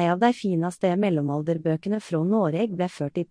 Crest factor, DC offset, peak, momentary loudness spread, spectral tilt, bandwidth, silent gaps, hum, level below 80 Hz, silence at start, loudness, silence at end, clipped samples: 16 dB; under 0.1%; -6 dBFS; 5 LU; -7.5 dB/octave; 10.5 kHz; none; none; -68 dBFS; 0 s; -25 LUFS; 0.05 s; under 0.1%